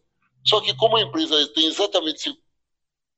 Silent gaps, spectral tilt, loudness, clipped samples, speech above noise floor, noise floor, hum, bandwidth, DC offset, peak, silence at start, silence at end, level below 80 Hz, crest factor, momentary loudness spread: none; -3 dB/octave; -20 LUFS; under 0.1%; 60 dB; -81 dBFS; none; 8.2 kHz; under 0.1%; -4 dBFS; 0.45 s; 0.85 s; -66 dBFS; 18 dB; 7 LU